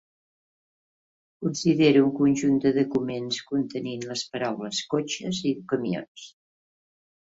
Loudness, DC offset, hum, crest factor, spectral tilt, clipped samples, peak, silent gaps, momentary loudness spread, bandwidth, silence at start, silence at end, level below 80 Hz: -25 LUFS; under 0.1%; none; 18 dB; -5 dB/octave; under 0.1%; -8 dBFS; 6.08-6.15 s; 12 LU; 8 kHz; 1.4 s; 1.1 s; -66 dBFS